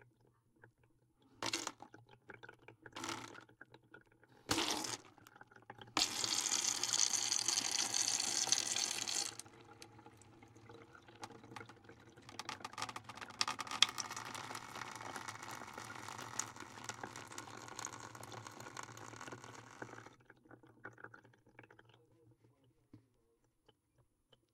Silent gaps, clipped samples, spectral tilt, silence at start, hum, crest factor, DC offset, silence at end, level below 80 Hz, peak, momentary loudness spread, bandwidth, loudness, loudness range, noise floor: none; under 0.1%; 0 dB/octave; 0 s; none; 34 dB; under 0.1%; 1.55 s; -78 dBFS; -10 dBFS; 25 LU; 16.5 kHz; -38 LUFS; 19 LU; -78 dBFS